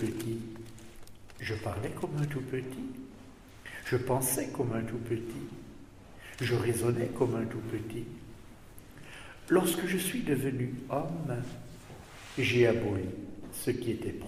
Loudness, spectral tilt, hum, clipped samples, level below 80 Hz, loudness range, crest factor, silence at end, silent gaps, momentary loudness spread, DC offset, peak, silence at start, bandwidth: -33 LUFS; -5.5 dB/octave; none; under 0.1%; -56 dBFS; 5 LU; 20 dB; 0 s; none; 21 LU; under 0.1%; -12 dBFS; 0 s; 15.5 kHz